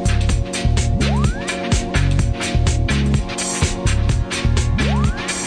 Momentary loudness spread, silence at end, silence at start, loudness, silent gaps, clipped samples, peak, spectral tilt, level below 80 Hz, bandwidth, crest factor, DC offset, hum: 2 LU; 0 s; 0 s; -19 LUFS; none; under 0.1%; -6 dBFS; -5 dB/octave; -22 dBFS; 10 kHz; 12 dB; under 0.1%; none